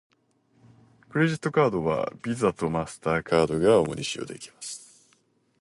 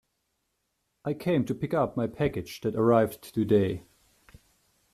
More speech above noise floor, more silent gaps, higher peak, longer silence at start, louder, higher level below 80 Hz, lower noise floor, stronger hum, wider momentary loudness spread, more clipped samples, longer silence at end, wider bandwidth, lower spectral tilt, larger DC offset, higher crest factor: second, 41 dB vs 51 dB; neither; about the same, -8 dBFS vs -10 dBFS; about the same, 1.15 s vs 1.05 s; about the same, -25 LUFS vs -27 LUFS; about the same, -54 dBFS vs -58 dBFS; second, -66 dBFS vs -78 dBFS; neither; first, 16 LU vs 10 LU; neither; second, 0.8 s vs 1.15 s; second, 11.5 kHz vs 14.5 kHz; second, -5.5 dB/octave vs -7.5 dB/octave; neither; about the same, 18 dB vs 20 dB